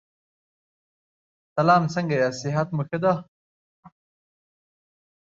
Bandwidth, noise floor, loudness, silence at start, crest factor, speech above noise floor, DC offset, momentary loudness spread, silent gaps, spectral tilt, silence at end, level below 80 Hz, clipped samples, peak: 7.8 kHz; under -90 dBFS; -23 LUFS; 1.55 s; 22 dB; over 68 dB; under 0.1%; 8 LU; 3.28-3.83 s; -6.5 dB/octave; 1.45 s; -68 dBFS; under 0.1%; -6 dBFS